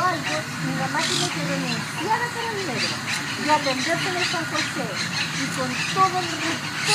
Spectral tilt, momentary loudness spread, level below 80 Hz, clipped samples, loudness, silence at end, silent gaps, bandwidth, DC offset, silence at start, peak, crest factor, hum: -3 dB/octave; 5 LU; -62 dBFS; under 0.1%; -23 LUFS; 0 s; none; 16 kHz; under 0.1%; 0 s; -4 dBFS; 20 dB; none